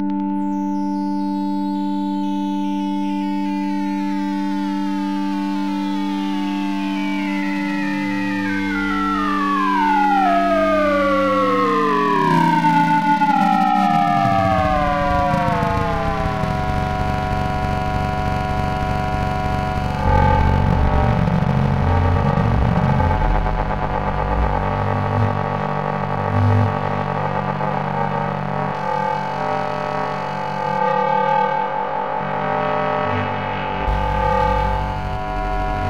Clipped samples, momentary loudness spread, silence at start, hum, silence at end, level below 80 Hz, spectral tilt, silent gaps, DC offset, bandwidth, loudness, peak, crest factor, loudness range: under 0.1%; 6 LU; 0 s; none; 0 s; -30 dBFS; -7.5 dB/octave; none; 1%; 15 kHz; -19 LUFS; -4 dBFS; 16 dB; 6 LU